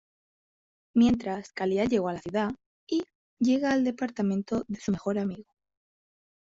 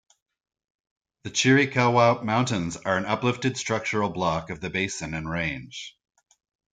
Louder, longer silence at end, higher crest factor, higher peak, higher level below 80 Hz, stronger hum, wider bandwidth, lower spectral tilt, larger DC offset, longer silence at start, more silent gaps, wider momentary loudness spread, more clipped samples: second, -28 LUFS vs -24 LUFS; first, 1 s vs 0.8 s; about the same, 16 dB vs 20 dB; second, -12 dBFS vs -6 dBFS; about the same, -60 dBFS vs -56 dBFS; neither; second, 7.8 kHz vs 9.4 kHz; first, -6.5 dB/octave vs -4.5 dB/octave; neither; second, 0.95 s vs 1.25 s; first, 2.66-2.87 s, 3.15-3.37 s vs none; about the same, 10 LU vs 12 LU; neither